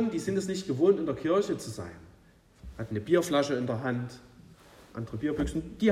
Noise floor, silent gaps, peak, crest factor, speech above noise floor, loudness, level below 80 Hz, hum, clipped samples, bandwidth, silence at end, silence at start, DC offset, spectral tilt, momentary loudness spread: -59 dBFS; none; -10 dBFS; 20 dB; 30 dB; -29 LUFS; -50 dBFS; none; under 0.1%; 15 kHz; 0 s; 0 s; under 0.1%; -6 dB/octave; 17 LU